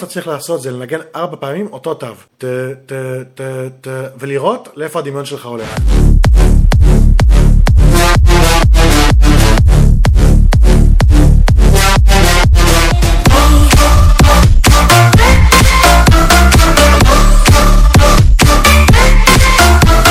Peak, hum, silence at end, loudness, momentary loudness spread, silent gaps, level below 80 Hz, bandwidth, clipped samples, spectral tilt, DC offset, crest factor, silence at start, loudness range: 0 dBFS; none; 0 s; -8 LUFS; 15 LU; none; -10 dBFS; 16.5 kHz; 2%; -4.5 dB/octave; under 0.1%; 8 dB; 0 s; 14 LU